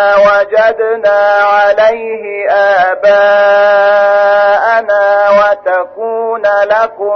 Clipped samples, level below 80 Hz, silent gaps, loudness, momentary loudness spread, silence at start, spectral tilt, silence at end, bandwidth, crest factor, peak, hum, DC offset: under 0.1%; -52 dBFS; none; -9 LUFS; 7 LU; 0 s; -3.5 dB/octave; 0 s; 6.4 kHz; 8 dB; 0 dBFS; none; under 0.1%